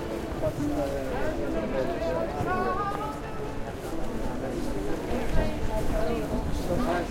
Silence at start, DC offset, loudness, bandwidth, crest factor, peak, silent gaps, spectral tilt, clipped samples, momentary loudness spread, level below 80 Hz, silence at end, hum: 0 s; under 0.1%; -30 LUFS; 16.5 kHz; 18 dB; -10 dBFS; none; -6.5 dB/octave; under 0.1%; 6 LU; -36 dBFS; 0 s; none